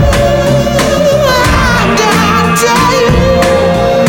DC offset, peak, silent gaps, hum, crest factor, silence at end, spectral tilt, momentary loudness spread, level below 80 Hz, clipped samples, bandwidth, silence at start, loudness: under 0.1%; 0 dBFS; none; none; 8 dB; 0 s; -5 dB/octave; 2 LU; -20 dBFS; under 0.1%; 18 kHz; 0 s; -8 LUFS